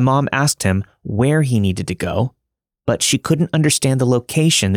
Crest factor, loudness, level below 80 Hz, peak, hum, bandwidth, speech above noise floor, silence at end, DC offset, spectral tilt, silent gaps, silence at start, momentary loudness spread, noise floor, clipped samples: 14 dB; -17 LUFS; -50 dBFS; -2 dBFS; none; 19 kHz; 59 dB; 0 s; under 0.1%; -4.5 dB/octave; none; 0 s; 7 LU; -75 dBFS; under 0.1%